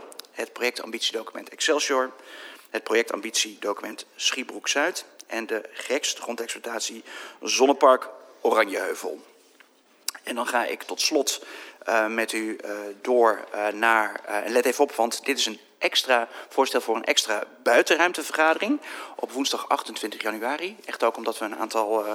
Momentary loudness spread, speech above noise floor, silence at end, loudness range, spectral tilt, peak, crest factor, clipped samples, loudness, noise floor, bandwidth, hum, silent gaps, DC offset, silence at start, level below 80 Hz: 13 LU; 32 dB; 0 s; 5 LU; -0.5 dB/octave; -4 dBFS; 22 dB; under 0.1%; -25 LUFS; -57 dBFS; 17.5 kHz; none; none; under 0.1%; 0 s; -90 dBFS